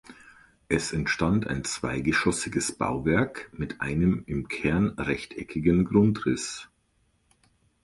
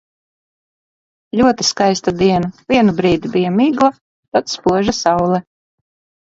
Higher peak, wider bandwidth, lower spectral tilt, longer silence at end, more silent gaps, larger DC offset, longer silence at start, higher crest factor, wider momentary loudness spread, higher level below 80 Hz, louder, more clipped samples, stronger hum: second, -8 dBFS vs 0 dBFS; first, 11.5 kHz vs 7.8 kHz; about the same, -5.5 dB/octave vs -5 dB/octave; first, 1.2 s vs 0.8 s; second, none vs 4.01-4.32 s; neither; second, 0.1 s vs 1.35 s; about the same, 20 dB vs 16 dB; first, 10 LU vs 6 LU; about the same, -46 dBFS vs -46 dBFS; second, -27 LUFS vs -15 LUFS; neither; neither